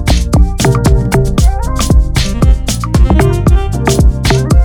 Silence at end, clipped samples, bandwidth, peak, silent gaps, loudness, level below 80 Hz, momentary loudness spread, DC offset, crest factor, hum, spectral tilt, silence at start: 0 s; under 0.1%; 16.5 kHz; 0 dBFS; none; -11 LUFS; -12 dBFS; 3 LU; under 0.1%; 8 dB; none; -5.5 dB/octave; 0 s